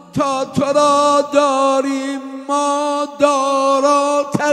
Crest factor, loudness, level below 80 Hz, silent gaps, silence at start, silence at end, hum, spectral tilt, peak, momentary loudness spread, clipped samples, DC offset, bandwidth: 16 dB; -15 LUFS; -58 dBFS; none; 0.15 s; 0 s; none; -4 dB/octave; 0 dBFS; 7 LU; under 0.1%; under 0.1%; 12.5 kHz